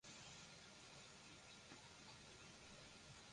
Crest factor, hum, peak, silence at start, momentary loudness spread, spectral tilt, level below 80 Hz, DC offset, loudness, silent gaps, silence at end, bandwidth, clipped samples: 18 dB; none; -44 dBFS; 0.05 s; 2 LU; -2.5 dB/octave; -78 dBFS; under 0.1%; -60 LUFS; none; 0 s; 11 kHz; under 0.1%